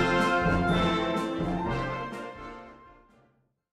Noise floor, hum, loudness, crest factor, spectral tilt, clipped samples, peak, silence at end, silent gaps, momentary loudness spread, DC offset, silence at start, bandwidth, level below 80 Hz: -68 dBFS; none; -28 LUFS; 16 dB; -6 dB/octave; under 0.1%; -12 dBFS; 0.8 s; none; 17 LU; under 0.1%; 0 s; 12.5 kHz; -44 dBFS